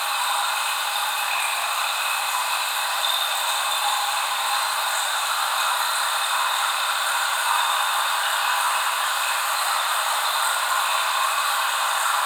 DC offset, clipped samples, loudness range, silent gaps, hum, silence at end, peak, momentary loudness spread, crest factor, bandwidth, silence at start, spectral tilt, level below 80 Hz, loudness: under 0.1%; under 0.1%; 1 LU; none; none; 0 s; -8 dBFS; 2 LU; 16 dB; over 20 kHz; 0 s; 4 dB/octave; -72 dBFS; -21 LUFS